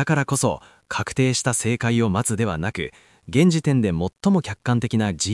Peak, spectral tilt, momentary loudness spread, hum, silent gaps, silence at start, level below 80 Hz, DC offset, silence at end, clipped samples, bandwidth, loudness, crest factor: -6 dBFS; -5 dB/octave; 9 LU; none; none; 0 s; -52 dBFS; under 0.1%; 0 s; under 0.1%; 12 kHz; -22 LUFS; 16 dB